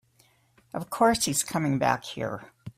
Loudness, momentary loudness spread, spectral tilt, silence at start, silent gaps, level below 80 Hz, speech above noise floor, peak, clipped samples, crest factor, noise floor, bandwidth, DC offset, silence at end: -26 LUFS; 15 LU; -4 dB/octave; 0.75 s; none; -58 dBFS; 37 dB; -8 dBFS; under 0.1%; 20 dB; -64 dBFS; 16 kHz; under 0.1%; 0.05 s